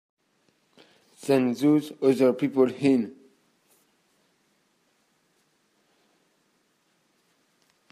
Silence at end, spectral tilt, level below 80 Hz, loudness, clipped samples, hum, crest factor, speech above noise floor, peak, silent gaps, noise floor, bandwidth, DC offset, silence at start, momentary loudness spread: 4.8 s; -7 dB/octave; -78 dBFS; -24 LUFS; under 0.1%; none; 20 dB; 47 dB; -8 dBFS; none; -69 dBFS; 14.5 kHz; under 0.1%; 1.25 s; 5 LU